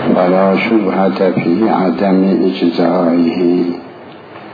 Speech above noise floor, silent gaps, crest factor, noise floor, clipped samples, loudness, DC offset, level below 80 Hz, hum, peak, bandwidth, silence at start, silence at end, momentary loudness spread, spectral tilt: 21 dB; none; 12 dB; -33 dBFS; under 0.1%; -13 LUFS; under 0.1%; -58 dBFS; none; 0 dBFS; 5 kHz; 0 s; 0 s; 9 LU; -9.5 dB/octave